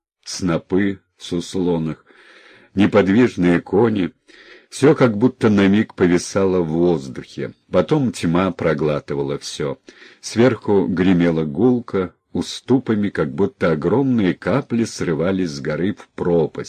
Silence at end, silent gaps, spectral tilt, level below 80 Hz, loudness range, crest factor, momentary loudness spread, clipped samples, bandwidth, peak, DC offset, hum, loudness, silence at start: 0 s; none; -6.5 dB/octave; -46 dBFS; 3 LU; 16 dB; 11 LU; under 0.1%; 10.5 kHz; -2 dBFS; under 0.1%; none; -19 LUFS; 0.25 s